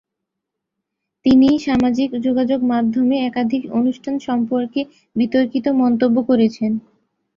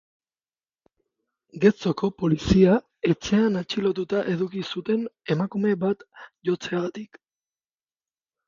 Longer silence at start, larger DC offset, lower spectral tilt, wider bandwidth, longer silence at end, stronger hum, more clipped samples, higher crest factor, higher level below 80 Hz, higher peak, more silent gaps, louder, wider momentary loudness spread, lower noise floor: second, 1.25 s vs 1.55 s; neither; about the same, -7 dB/octave vs -7 dB/octave; about the same, 7.2 kHz vs 7.4 kHz; second, 0.55 s vs 1.45 s; neither; neither; second, 14 dB vs 20 dB; about the same, -52 dBFS vs -48 dBFS; about the same, -4 dBFS vs -4 dBFS; neither; first, -18 LUFS vs -24 LUFS; about the same, 8 LU vs 10 LU; second, -80 dBFS vs under -90 dBFS